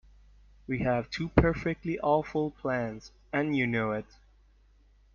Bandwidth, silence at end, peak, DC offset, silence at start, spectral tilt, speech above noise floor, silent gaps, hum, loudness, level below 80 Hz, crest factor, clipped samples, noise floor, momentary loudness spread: 7.2 kHz; 1.1 s; -6 dBFS; under 0.1%; 0.7 s; -7.5 dB/octave; 32 dB; none; none; -30 LUFS; -46 dBFS; 24 dB; under 0.1%; -61 dBFS; 11 LU